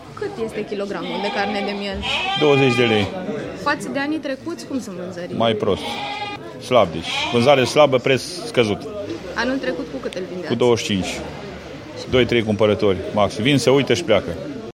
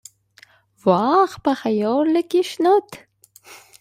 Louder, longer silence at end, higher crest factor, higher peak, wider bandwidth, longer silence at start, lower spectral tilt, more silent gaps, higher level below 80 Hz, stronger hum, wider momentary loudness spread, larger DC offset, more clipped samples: about the same, -20 LUFS vs -19 LUFS; second, 0 s vs 0.25 s; about the same, 20 dB vs 18 dB; first, 0 dBFS vs -4 dBFS; about the same, 16 kHz vs 15.5 kHz; second, 0 s vs 0.85 s; about the same, -5 dB/octave vs -6 dB/octave; neither; first, -48 dBFS vs -64 dBFS; neither; first, 14 LU vs 5 LU; neither; neither